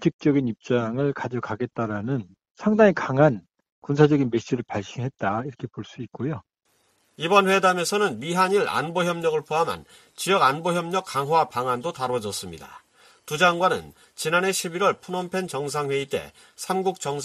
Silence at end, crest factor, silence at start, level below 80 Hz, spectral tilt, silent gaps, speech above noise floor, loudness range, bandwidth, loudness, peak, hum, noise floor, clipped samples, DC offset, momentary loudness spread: 0 s; 22 dB; 0 s; -62 dBFS; -5 dB/octave; 0.14-0.19 s, 2.51-2.55 s, 3.72-3.82 s; 44 dB; 3 LU; 14.5 kHz; -24 LUFS; -2 dBFS; none; -67 dBFS; under 0.1%; under 0.1%; 13 LU